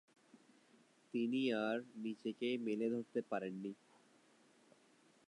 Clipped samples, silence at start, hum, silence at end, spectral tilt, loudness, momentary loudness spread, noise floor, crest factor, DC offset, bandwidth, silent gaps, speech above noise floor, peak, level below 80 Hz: under 0.1%; 0.35 s; none; 1.55 s; -6 dB/octave; -41 LUFS; 10 LU; -71 dBFS; 16 dB; under 0.1%; 10.5 kHz; none; 30 dB; -26 dBFS; under -90 dBFS